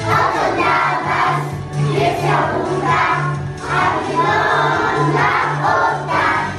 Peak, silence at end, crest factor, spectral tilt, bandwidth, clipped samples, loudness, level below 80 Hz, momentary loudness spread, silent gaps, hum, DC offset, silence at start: -2 dBFS; 0 s; 14 dB; -5.5 dB/octave; 13 kHz; under 0.1%; -16 LUFS; -44 dBFS; 4 LU; none; none; under 0.1%; 0 s